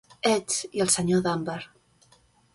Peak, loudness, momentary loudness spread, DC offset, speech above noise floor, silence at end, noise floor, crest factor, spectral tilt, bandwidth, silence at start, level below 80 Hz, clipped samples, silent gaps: -8 dBFS; -25 LUFS; 14 LU; under 0.1%; 36 dB; 0.9 s; -61 dBFS; 20 dB; -3.5 dB/octave; 11.5 kHz; 0.25 s; -60 dBFS; under 0.1%; none